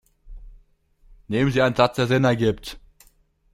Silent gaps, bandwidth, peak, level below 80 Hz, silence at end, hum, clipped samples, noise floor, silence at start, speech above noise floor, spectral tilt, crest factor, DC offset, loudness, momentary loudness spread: none; 15.5 kHz; -4 dBFS; -46 dBFS; 0.75 s; none; under 0.1%; -59 dBFS; 0.25 s; 39 dB; -6.5 dB/octave; 20 dB; under 0.1%; -21 LUFS; 11 LU